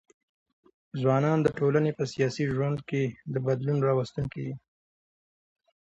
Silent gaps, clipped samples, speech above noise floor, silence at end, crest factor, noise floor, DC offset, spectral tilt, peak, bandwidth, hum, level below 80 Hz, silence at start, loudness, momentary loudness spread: none; under 0.1%; over 63 dB; 1.25 s; 18 dB; under -90 dBFS; under 0.1%; -7.5 dB/octave; -10 dBFS; 8 kHz; none; -60 dBFS; 0.95 s; -28 LUFS; 10 LU